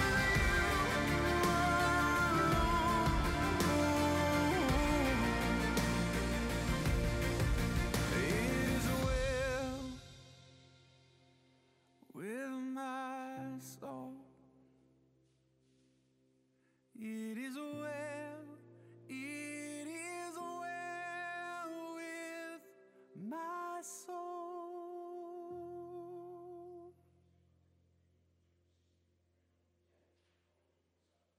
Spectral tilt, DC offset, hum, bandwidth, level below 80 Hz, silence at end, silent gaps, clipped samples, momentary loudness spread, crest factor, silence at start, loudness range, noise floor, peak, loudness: -5 dB/octave; under 0.1%; none; 16 kHz; -46 dBFS; 4.45 s; none; under 0.1%; 18 LU; 16 dB; 0 s; 18 LU; -80 dBFS; -20 dBFS; -36 LUFS